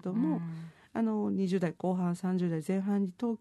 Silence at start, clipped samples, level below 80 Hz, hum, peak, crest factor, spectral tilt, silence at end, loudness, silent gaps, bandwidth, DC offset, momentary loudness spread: 0.05 s; under 0.1%; -76 dBFS; none; -18 dBFS; 12 dB; -8.5 dB/octave; 0.05 s; -32 LUFS; none; 12 kHz; under 0.1%; 5 LU